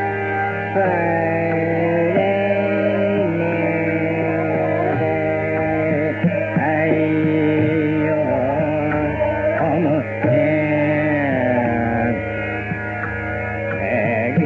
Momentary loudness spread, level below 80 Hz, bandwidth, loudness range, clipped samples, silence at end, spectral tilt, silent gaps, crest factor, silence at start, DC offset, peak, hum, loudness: 5 LU; -46 dBFS; 4.9 kHz; 1 LU; under 0.1%; 0 s; -7 dB/octave; none; 14 dB; 0 s; under 0.1%; -4 dBFS; none; -19 LUFS